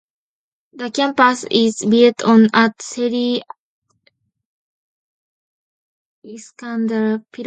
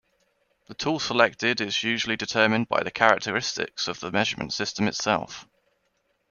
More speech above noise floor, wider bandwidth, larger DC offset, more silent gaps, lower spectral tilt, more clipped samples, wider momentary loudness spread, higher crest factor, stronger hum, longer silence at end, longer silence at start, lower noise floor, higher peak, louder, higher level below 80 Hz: about the same, 47 dB vs 47 dB; first, 9.2 kHz vs 7.4 kHz; neither; first, 3.59-3.82 s, 4.45-6.22 s vs none; about the same, -4.5 dB/octave vs -3.5 dB/octave; neither; first, 16 LU vs 8 LU; second, 18 dB vs 24 dB; neither; second, 0 s vs 0.85 s; about the same, 0.75 s vs 0.7 s; second, -63 dBFS vs -72 dBFS; about the same, 0 dBFS vs -2 dBFS; first, -16 LUFS vs -24 LUFS; second, -68 dBFS vs -62 dBFS